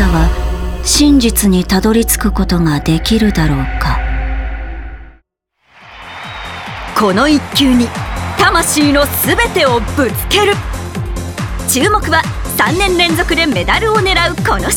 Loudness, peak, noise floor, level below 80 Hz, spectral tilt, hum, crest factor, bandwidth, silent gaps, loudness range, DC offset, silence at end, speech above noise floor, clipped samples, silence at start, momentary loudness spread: -12 LUFS; 0 dBFS; -60 dBFS; -22 dBFS; -4 dB/octave; none; 12 dB; over 20 kHz; none; 7 LU; under 0.1%; 0 s; 49 dB; under 0.1%; 0 s; 13 LU